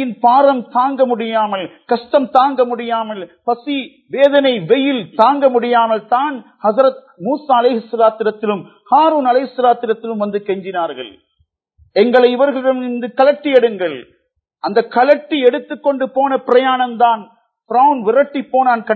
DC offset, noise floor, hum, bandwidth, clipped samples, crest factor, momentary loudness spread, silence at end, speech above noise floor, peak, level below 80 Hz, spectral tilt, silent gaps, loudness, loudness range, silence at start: under 0.1%; -63 dBFS; none; 4.6 kHz; under 0.1%; 14 dB; 10 LU; 0 s; 49 dB; 0 dBFS; -68 dBFS; -7.5 dB/octave; none; -15 LUFS; 2 LU; 0 s